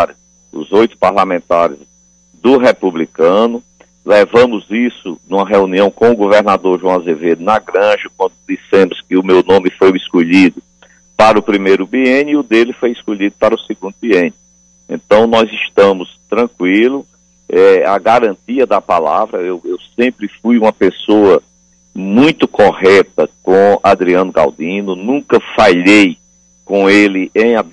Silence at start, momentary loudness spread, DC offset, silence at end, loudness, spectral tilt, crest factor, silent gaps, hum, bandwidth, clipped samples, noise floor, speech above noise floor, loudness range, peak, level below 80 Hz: 0 s; 10 LU; under 0.1%; 0.1 s; -11 LUFS; -5.5 dB/octave; 12 dB; none; 60 Hz at -50 dBFS; 10 kHz; under 0.1%; -48 dBFS; 38 dB; 3 LU; 0 dBFS; -48 dBFS